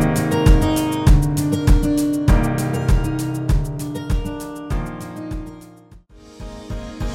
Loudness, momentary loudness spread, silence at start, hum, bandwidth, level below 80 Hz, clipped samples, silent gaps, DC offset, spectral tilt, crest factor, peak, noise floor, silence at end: -19 LUFS; 16 LU; 0 s; none; 16 kHz; -22 dBFS; under 0.1%; none; under 0.1%; -6.5 dB/octave; 18 dB; 0 dBFS; -45 dBFS; 0 s